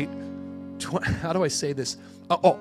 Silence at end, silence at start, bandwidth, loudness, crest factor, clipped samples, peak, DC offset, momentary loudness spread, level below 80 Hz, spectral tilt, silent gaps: 0 s; 0 s; 15 kHz; -27 LUFS; 20 dB; under 0.1%; -6 dBFS; under 0.1%; 15 LU; -52 dBFS; -4.5 dB/octave; none